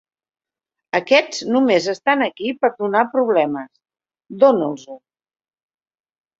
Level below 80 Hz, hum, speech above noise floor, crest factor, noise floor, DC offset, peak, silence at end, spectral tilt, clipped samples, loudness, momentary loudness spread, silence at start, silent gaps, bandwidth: -68 dBFS; none; 67 dB; 20 dB; -85 dBFS; under 0.1%; 0 dBFS; 1.4 s; -4.5 dB/octave; under 0.1%; -18 LUFS; 9 LU; 0.95 s; none; 7.8 kHz